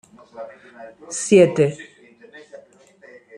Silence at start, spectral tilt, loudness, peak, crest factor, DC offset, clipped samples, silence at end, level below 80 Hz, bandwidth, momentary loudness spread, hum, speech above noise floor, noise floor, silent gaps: 0.35 s; -5.5 dB/octave; -17 LUFS; -2 dBFS; 20 dB; under 0.1%; under 0.1%; 0.8 s; -64 dBFS; 11.5 kHz; 27 LU; none; 31 dB; -50 dBFS; none